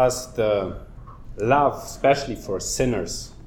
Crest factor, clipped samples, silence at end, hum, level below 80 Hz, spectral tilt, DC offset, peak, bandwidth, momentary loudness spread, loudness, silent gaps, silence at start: 18 dB; under 0.1%; 0 s; none; -40 dBFS; -4.5 dB/octave; under 0.1%; -6 dBFS; 19 kHz; 14 LU; -23 LUFS; none; 0 s